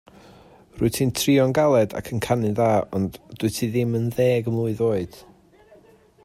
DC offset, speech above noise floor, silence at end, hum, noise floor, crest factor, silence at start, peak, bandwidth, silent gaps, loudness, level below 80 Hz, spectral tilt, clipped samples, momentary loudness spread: under 0.1%; 32 dB; 1.05 s; none; -53 dBFS; 16 dB; 0.75 s; -6 dBFS; 16 kHz; none; -22 LUFS; -52 dBFS; -6 dB/octave; under 0.1%; 9 LU